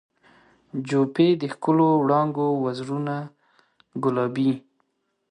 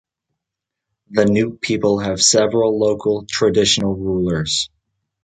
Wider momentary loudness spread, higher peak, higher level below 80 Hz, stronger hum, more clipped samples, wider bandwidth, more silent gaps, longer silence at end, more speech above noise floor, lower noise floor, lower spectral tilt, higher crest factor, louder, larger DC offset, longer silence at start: first, 14 LU vs 7 LU; second, -8 dBFS vs -2 dBFS; second, -70 dBFS vs -46 dBFS; neither; neither; about the same, 10 kHz vs 9.6 kHz; neither; first, 0.7 s vs 0.55 s; second, 50 dB vs 66 dB; second, -72 dBFS vs -83 dBFS; first, -8 dB/octave vs -3.5 dB/octave; about the same, 16 dB vs 16 dB; second, -23 LUFS vs -17 LUFS; neither; second, 0.75 s vs 1.1 s